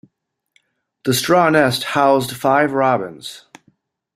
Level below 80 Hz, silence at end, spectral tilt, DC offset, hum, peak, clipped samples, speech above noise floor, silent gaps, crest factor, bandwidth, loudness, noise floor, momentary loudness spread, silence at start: -58 dBFS; 0.8 s; -4.5 dB/octave; under 0.1%; none; -2 dBFS; under 0.1%; 55 dB; none; 18 dB; 16 kHz; -16 LUFS; -71 dBFS; 14 LU; 1.05 s